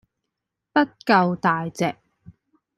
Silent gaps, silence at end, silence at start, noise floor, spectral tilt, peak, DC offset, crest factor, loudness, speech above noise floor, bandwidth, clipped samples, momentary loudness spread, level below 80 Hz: none; 0.85 s; 0.75 s; -82 dBFS; -6 dB/octave; -2 dBFS; under 0.1%; 22 dB; -22 LUFS; 61 dB; 13.5 kHz; under 0.1%; 8 LU; -64 dBFS